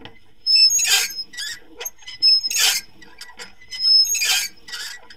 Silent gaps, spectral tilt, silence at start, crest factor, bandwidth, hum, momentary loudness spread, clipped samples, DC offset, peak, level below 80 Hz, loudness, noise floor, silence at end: none; 3.5 dB/octave; 0 s; 18 dB; 17 kHz; none; 19 LU; under 0.1%; 0.7%; -2 dBFS; -60 dBFS; -15 LUFS; -43 dBFS; 0.2 s